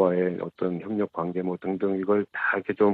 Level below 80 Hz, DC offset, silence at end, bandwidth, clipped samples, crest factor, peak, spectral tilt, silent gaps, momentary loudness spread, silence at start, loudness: -68 dBFS; under 0.1%; 0 s; 4.5 kHz; under 0.1%; 18 dB; -8 dBFS; -10 dB/octave; none; 6 LU; 0 s; -27 LUFS